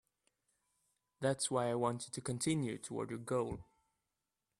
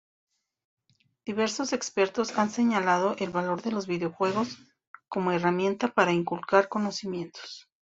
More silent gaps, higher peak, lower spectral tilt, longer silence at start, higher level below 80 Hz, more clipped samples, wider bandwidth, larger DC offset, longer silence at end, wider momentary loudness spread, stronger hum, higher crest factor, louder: second, none vs 4.87-4.94 s; second, -20 dBFS vs -6 dBFS; about the same, -5 dB/octave vs -5 dB/octave; about the same, 1.2 s vs 1.25 s; about the same, -70 dBFS vs -70 dBFS; neither; first, 13.5 kHz vs 8 kHz; neither; first, 0.95 s vs 0.35 s; second, 8 LU vs 12 LU; neither; about the same, 20 dB vs 22 dB; second, -38 LUFS vs -27 LUFS